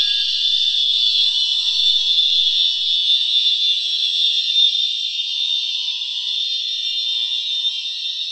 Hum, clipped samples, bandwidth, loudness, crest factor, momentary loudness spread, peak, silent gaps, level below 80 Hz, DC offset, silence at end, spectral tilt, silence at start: none; under 0.1%; 10 kHz; -15 LUFS; 14 dB; 6 LU; -4 dBFS; none; -70 dBFS; under 0.1%; 0 s; 6 dB/octave; 0 s